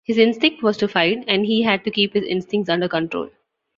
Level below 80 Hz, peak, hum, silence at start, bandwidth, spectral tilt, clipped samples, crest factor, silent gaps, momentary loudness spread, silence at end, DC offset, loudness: -60 dBFS; -2 dBFS; none; 0.1 s; 7.4 kHz; -6 dB/octave; under 0.1%; 18 dB; none; 6 LU; 0.5 s; under 0.1%; -19 LUFS